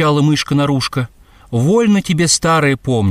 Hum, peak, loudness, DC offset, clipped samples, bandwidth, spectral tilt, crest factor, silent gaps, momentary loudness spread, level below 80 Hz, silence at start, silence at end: none; 0 dBFS; -14 LUFS; under 0.1%; under 0.1%; 15.5 kHz; -5 dB/octave; 14 dB; none; 9 LU; -44 dBFS; 0 s; 0 s